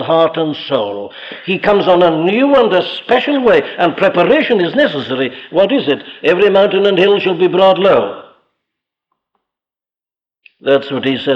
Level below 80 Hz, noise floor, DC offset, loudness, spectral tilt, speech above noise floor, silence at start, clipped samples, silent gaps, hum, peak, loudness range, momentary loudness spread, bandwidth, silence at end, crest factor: -52 dBFS; under -90 dBFS; under 0.1%; -12 LUFS; -7 dB/octave; over 78 dB; 0 s; under 0.1%; none; none; -2 dBFS; 5 LU; 9 LU; 7 kHz; 0 s; 12 dB